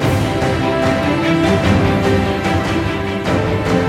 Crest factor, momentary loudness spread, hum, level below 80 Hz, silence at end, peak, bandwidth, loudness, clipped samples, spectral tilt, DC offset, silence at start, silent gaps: 14 dB; 4 LU; none; -32 dBFS; 0 s; -2 dBFS; 16 kHz; -16 LUFS; under 0.1%; -6.5 dB/octave; under 0.1%; 0 s; none